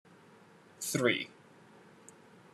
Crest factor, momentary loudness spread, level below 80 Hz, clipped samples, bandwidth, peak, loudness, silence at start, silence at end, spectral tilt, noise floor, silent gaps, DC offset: 24 dB; 26 LU; -84 dBFS; under 0.1%; 14 kHz; -16 dBFS; -33 LUFS; 0.8 s; 1.25 s; -3.5 dB/octave; -59 dBFS; none; under 0.1%